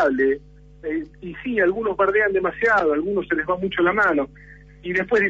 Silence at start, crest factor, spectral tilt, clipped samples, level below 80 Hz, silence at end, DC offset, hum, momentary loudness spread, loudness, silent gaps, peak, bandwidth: 0 s; 14 dB; -6.5 dB/octave; under 0.1%; -48 dBFS; 0 s; under 0.1%; none; 12 LU; -21 LUFS; none; -8 dBFS; 7.8 kHz